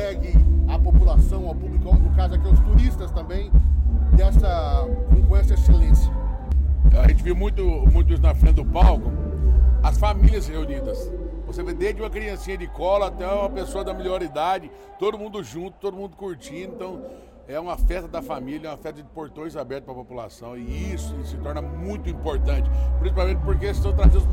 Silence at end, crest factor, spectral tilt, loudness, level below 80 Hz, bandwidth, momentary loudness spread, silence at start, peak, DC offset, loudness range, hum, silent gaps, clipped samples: 0 s; 16 dB; -8 dB/octave; -22 LUFS; -20 dBFS; 8.6 kHz; 16 LU; 0 s; -2 dBFS; under 0.1%; 12 LU; none; none; under 0.1%